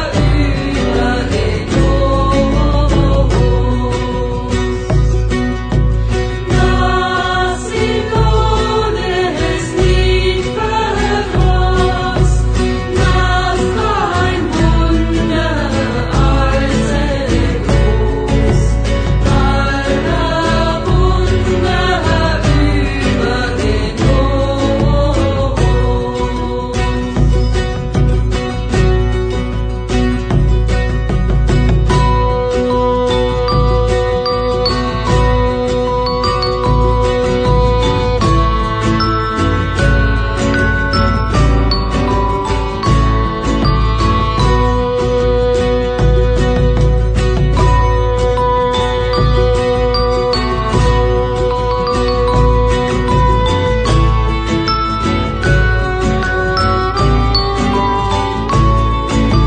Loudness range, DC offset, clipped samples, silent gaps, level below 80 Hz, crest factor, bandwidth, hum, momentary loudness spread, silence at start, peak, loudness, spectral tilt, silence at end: 2 LU; under 0.1%; under 0.1%; none; -16 dBFS; 12 dB; 9.2 kHz; none; 3 LU; 0 s; 0 dBFS; -14 LUFS; -6.5 dB/octave; 0 s